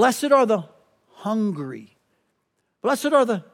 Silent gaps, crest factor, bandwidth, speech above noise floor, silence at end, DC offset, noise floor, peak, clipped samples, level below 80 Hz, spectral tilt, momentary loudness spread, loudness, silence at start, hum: none; 18 dB; 17 kHz; 53 dB; 0.15 s; under 0.1%; -73 dBFS; -4 dBFS; under 0.1%; -82 dBFS; -5 dB/octave; 15 LU; -21 LUFS; 0 s; none